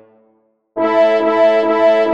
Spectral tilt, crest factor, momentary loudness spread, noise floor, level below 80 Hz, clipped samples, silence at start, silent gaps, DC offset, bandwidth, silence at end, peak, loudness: -5.5 dB/octave; 12 dB; 7 LU; -58 dBFS; -68 dBFS; under 0.1%; 0.75 s; none; under 0.1%; 7.4 kHz; 0 s; -2 dBFS; -13 LUFS